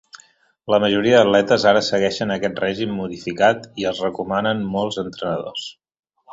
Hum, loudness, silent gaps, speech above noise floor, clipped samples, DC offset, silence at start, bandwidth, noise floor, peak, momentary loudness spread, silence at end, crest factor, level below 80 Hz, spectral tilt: none; -19 LUFS; 5.99-6.03 s; 35 dB; under 0.1%; under 0.1%; 0.15 s; 8 kHz; -54 dBFS; -2 dBFS; 12 LU; 0 s; 18 dB; -56 dBFS; -5 dB/octave